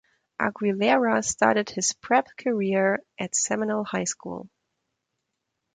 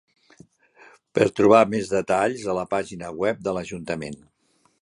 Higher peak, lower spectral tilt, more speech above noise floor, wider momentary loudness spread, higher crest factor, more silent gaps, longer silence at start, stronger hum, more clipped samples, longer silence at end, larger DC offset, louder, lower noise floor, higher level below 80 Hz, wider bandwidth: about the same, -4 dBFS vs -2 dBFS; second, -3.5 dB/octave vs -5.5 dB/octave; first, 56 dB vs 43 dB; second, 8 LU vs 15 LU; about the same, 22 dB vs 22 dB; neither; second, 0.4 s vs 1.15 s; neither; neither; first, 1.3 s vs 0.65 s; neither; about the same, -24 LUFS vs -23 LUFS; first, -81 dBFS vs -65 dBFS; second, -66 dBFS vs -58 dBFS; second, 9.6 kHz vs 11.5 kHz